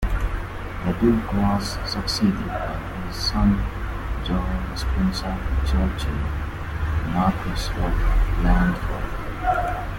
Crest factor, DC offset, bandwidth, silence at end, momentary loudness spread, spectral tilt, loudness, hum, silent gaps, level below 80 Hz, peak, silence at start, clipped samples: 16 dB; under 0.1%; 16.5 kHz; 0 s; 9 LU; -6 dB/octave; -24 LUFS; none; none; -26 dBFS; -6 dBFS; 0 s; under 0.1%